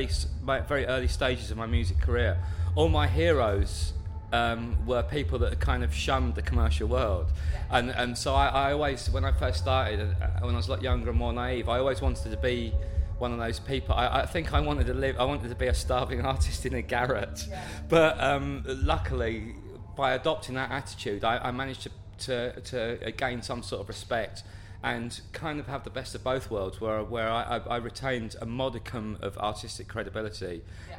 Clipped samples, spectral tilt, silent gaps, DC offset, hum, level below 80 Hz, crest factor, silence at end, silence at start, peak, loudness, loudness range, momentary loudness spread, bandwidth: under 0.1%; -5.5 dB/octave; none; under 0.1%; none; -34 dBFS; 22 dB; 0 s; 0 s; -8 dBFS; -29 LUFS; 6 LU; 10 LU; 15.5 kHz